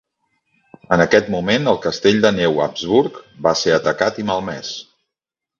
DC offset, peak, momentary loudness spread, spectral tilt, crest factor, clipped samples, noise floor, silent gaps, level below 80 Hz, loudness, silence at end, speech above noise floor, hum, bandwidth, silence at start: under 0.1%; 0 dBFS; 11 LU; -5 dB/octave; 18 dB; under 0.1%; -85 dBFS; none; -50 dBFS; -17 LUFS; 0.8 s; 68 dB; none; 7.4 kHz; 0.9 s